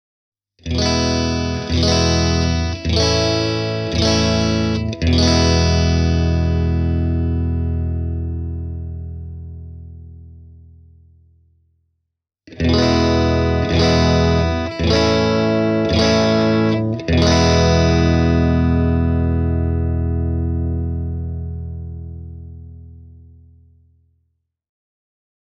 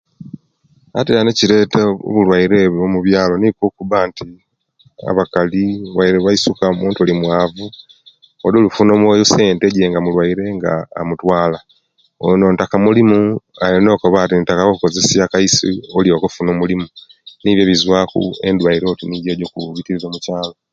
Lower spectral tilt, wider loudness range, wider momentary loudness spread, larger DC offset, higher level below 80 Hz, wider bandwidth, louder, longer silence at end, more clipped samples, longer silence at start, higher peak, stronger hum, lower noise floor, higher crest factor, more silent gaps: about the same, -5.5 dB/octave vs -5 dB/octave; first, 15 LU vs 3 LU; first, 16 LU vs 10 LU; neither; first, -26 dBFS vs -44 dBFS; about the same, 7.4 kHz vs 7.8 kHz; second, -17 LUFS vs -14 LUFS; first, 2.5 s vs 0.2 s; neither; first, 0.65 s vs 0.2 s; about the same, -2 dBFS vs 0 dBFS; neither; first, -77 dBFS vs -55 dBFS; about the same, 16 dB vs 14 dB; neither